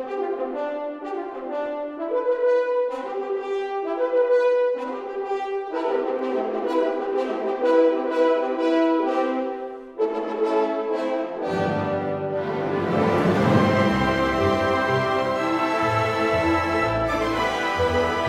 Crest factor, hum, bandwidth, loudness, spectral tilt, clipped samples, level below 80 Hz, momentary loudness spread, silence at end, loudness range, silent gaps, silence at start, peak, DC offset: 18 dB; none; 12.5 kHz; -23 LUFS; -6.5 dB/octave; under 0.1%; -48 dBFS; 9 LU; 0 s; 4 LU; none; 0 s; -6 dBFS; under 0.1%